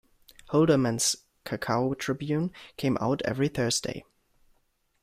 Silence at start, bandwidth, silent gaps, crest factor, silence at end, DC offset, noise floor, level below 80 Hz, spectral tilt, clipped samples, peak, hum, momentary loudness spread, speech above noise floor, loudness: 0.5 s; 16 kHz; none; 18 dB; 1 s; under 0.1%; -71 dBFS; -58 dBFS; -4.5 dB/octave; under 0.1%; -10 dBFS; none; 11 LU; 44 dB; -28 LUFS